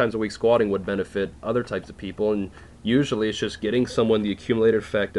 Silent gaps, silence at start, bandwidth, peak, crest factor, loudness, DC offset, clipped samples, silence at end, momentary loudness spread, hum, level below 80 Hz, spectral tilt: none; 0 s; 11 kHz; -8 dBFS; 16 dB; -24 LUFS; under 0.1%; under 0.1%; 0 s; 9 LU; none; -48 dBFS; -6 dB/octave